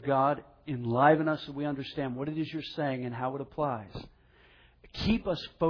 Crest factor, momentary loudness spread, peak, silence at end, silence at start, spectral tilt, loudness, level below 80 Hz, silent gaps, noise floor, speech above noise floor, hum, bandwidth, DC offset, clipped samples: 20 dB; 14 LU; -10 dBFS; 0 s; 0 s; -8 dB/octave; -31 LUFS; -52 dBFS; none; -60 dBFS; 30 dB; none; 5.4 kHz; under 0.1%; under 0.1%